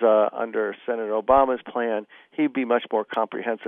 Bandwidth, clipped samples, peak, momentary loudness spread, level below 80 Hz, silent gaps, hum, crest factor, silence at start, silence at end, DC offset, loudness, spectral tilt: 3.8 kHz; under 0.1%; -4 dBFS; 8 LU; -56 dBFS; none; none; 18 dB; 0 s; 0 s; under 0.1%; -24 LUFS; -8 dB/octave